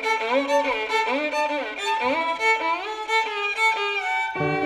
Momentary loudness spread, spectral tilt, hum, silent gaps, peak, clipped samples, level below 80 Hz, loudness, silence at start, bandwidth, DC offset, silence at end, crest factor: 5 LU; -3.5 dB/octave; none; none; -10 dBFS; under 0.1%; -62 dBFS; -23 LUFS; 0 s; 15 kHz; under 0.1%; 0 s; 14 dB